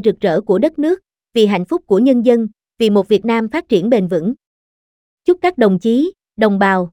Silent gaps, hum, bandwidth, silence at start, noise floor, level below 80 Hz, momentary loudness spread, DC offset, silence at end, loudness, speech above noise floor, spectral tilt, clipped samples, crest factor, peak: 4.46-5.18 s; none; 14.5 kHz; 0 s; under -90 dBFS; -54 dBFS; 8 LU; under 0.1%; 0.05 s; -15 LUFS; over 76 dB; -7 dB/octave; under 0.1%; 14 dB; 0 dBFS